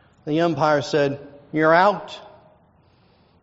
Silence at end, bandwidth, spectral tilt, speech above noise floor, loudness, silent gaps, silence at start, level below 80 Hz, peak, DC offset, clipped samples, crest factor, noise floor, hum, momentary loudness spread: 1.2 s; 7.8 kHz; -4 dB/octave; 38 dB; -20 LUFS; none; 0.25 s; -62 dBFS; -2 dBFS; under 0.1%; under 0.1%; 20 dB; -57 dBFS; none; 19 LU